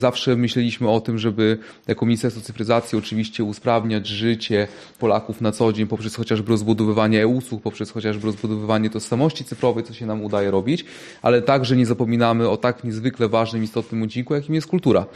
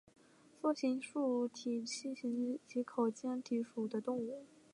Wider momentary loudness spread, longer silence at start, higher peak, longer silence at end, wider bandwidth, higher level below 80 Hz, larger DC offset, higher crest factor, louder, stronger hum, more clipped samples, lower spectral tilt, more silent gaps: first, 8 LU vs 5 LU; second, 0 s vs 0.65 s; first, -4 dBFS vs -22 dBFS; second, 0 s vs 0.3 s; first, 13 kHz vs 11 kHz; first, -58 dBFS vs -88 dBFS; neither; about the same, 18 dB vs 16 dB; first, -21 LUFS vs -39 LUFS; neither; neither; first, -6.5 dB/octave vs -4.5 dB/octave; neither